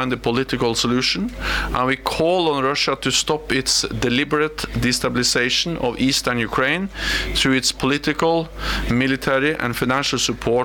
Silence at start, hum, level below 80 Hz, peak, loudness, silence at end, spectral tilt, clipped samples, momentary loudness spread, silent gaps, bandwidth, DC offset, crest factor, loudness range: 0 s; none; -36 dBFS; -6 dBFS; -19 LUFS; 0 s; -3.5 dB/octave; under 0.1%; 4 LU; none; 19 kHz; under 0.1%; 14 dB; 1 LU